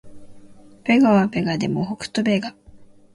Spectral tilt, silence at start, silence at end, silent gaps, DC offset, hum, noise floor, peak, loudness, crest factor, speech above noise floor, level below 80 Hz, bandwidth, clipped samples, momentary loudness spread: -6.5 dB/octave; 0.05 s; 0.3 s; none; under 0.1%; none; -46 dBFS; -6 dBFS; -20 LUFS; 16 dB; 27 dB; -54 dBFS; 11.5 kHz; under 0.1%; 11 LU